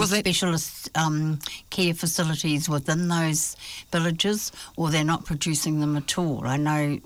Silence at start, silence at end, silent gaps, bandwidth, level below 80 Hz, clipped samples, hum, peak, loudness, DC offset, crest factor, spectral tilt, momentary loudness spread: 0 s; 0.05 s; none; 19.5 kHz; -52 dBFS; under 0.1%; none; -12 dBFS; -25 LUFS; under 0.1%; 12 dB; -4 dB/octave; 6 LU